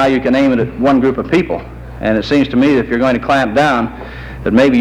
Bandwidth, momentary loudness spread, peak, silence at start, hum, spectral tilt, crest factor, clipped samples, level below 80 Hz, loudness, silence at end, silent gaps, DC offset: 10 kHz; 11 LU; 0 dBFS; 0 s; none; -6.5 dB/octave; 12 dB; under 0.1%; -34 dBFS; -13 LUFS; 0 s; none; under 0.1%